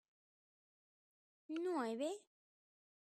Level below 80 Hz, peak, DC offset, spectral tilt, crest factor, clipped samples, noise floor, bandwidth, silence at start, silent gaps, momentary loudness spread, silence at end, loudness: under -90 dBFS; -30 dBFS; under 0.1%; -4 dB/octave; 18 dB; under 0.1%; under -90 dBFS; 13.5 kHz; 1.5 s; none; 8 LU; 0.95 s; -43 LUFS